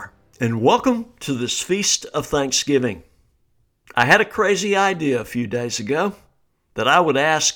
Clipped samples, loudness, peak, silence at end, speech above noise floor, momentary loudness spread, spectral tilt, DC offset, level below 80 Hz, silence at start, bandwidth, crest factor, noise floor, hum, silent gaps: under 0.1%; -19 LUFS; -2 dBFS; 0 s; 44 dB; 11 LU; -3 dB/octave; under 0.1%; -52 dBFS; 0 s; 19.5 kHz; 18 dB; -63 dBFS; none; none